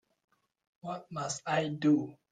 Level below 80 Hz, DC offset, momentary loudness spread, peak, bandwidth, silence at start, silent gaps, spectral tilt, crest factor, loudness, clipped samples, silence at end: -76 dBFS; under 0.1%; 14 LU; -18 dBFS; 9.4 kHz; 0.85 s; none; -5 dB/octave; 16 dB; -32 LUFS; under 0.1%; 0.2 s